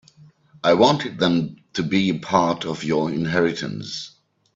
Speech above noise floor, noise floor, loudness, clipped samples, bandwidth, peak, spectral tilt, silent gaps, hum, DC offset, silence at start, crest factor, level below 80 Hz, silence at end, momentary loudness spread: 31 dB; -51 dBFS; -21 LUFS; under 0.1%; 7.8 kHz; -2 dBFS; -5.5 dB/octave; none; none; under 0.1%; 0.65 s; 20 dB; -58 dBFS; 0.45 s; 13 LU